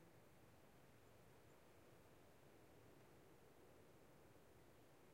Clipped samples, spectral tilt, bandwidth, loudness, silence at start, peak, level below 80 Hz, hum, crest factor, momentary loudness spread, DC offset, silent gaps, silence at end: under 0.1%; -5 dB/octave; 16 kHz; -69 LUFS; 0 s; -54 dBFS; -84 dBFS; none; 14 dB; 1 LU; under 0.1%; none; 0 s